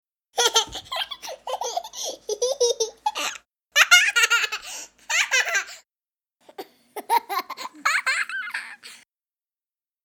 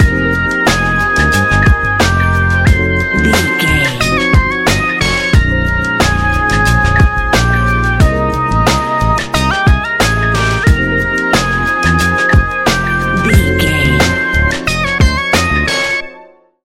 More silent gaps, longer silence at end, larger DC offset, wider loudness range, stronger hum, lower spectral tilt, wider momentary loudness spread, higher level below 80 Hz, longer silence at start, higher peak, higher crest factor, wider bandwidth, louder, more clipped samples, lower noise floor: neither; first, 1.1 s vs 0.4 s; neither; first, 7 LU vs 1 LU; neither; second, 2 dB/octave vs -5 dB/octave; first, 20 LU vs 3 LU; second, -66 dBFS vs -18 dBFS; first, 0.35 s vs 0 s; about the same, -2 dBFS vs 0 dBFS; first, 24 dB vs 12 dB; first, 19.5 kHz vs 16.5 kHz; second, -22 LUFS vs -11 LUFS; neither; first, under -90 dBFS vs -39 dBFS